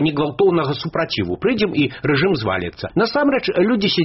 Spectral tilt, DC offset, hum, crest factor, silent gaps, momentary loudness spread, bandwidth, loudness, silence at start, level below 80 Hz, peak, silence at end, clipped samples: -4.5 dB/octave; under 0.1%; none; 12 dB; none; 5 LU; 6 kHz; -18 LUFS; 0 s; -48 dBFS; -6 dBFS; 0 s; under 0.1%